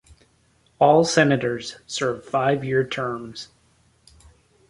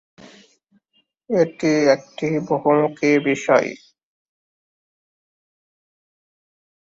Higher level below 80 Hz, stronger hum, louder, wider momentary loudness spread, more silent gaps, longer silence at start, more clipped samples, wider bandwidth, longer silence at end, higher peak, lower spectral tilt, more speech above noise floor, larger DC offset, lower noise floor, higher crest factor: first, -58 dBFS vs -66 dBFS; neither; about the same, -21 LUFS vs -19 LUFS; first, 17 LU vs 7 LU; neither; second, 0.8 s vs 1.3 s; neither; first, 11.5 kHz vs 7.8 kHz; second, 1.25 s vs 3.1 s; about the same, -2 dBFS vs -2 dBFS; about the same, -5 dB/octave vs -6 dB/octave; second, 40 dB vs 48 dB; neither; second, -61 dBFS vs -66 dBFS; about the same, 22 dB vs 20 dB